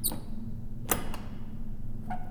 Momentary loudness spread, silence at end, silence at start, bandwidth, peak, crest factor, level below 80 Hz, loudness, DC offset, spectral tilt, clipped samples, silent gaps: 11 LU; 0 s; 0 s; 19.5 kHz; -6 dBFS; 26 dB; -38 dBFS; -37 LUFS; under 0.1%; -4 dB/octave; under 0.1%; none